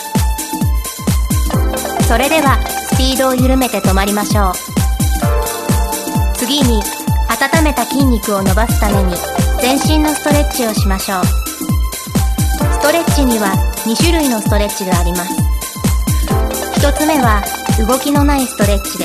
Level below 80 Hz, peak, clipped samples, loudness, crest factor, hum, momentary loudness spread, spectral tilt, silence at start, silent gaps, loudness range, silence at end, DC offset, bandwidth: -18 dBFS; 0 dBFS; under 0.1%; -14 LUFS; 14 dB; none; 5 LU; -4.5 dB/octave; 0 s; none; 2 LU; 0 s; under 0.1%; 14.5 kHz